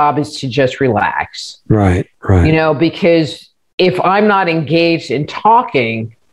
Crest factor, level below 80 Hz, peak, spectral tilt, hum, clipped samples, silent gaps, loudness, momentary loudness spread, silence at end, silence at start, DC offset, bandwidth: 12 dB; -40 dBFS; 0 dBFS; -6.5 dB/octave; none; under 0.1%; 3.73-3.78 s; -13 LUFS; 9 LU; 0.2 s; 0 s; under 0.1%; 11.5 kHz